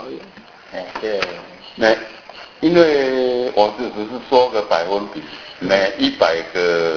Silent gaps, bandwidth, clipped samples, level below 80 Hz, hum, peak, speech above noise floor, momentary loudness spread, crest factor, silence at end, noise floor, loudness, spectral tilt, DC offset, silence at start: none; 5.4 kHz; under 0.1%; -54 dBFS; none; 0 dBFS; 24 dB; 19 LU; 18 dB; 0 s; -41 dBFS; -18 LUFS; -5 dB/octave; under 0.1%; 0 s